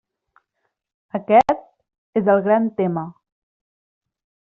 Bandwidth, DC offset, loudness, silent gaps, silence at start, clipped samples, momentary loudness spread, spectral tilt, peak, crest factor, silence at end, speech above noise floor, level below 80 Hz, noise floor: 7.4 kHz; under 0.1%; -19 LUFS; 1.98-2.13 s; 1.15 s; under 0.1%; 14 LU; -6.5 dB/octave; -4 dBFS; 20 dB; 1.45 s; 58 dB; -60 dBFS; -75 dBFS